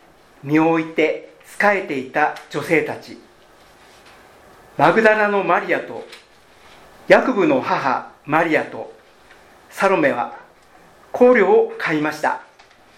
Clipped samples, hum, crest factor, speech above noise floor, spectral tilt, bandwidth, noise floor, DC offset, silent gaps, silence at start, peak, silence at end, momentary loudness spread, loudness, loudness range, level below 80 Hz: under 0.1%; none; 20 dB; 32 dB; -6 dB/octave; 15 kHz; -49 dBFS; under 0.1%; none; 0.45 s; 0 dBFS; 0.55 s; 18 LU; -18 LUFS; 4 LU; -62 dBFS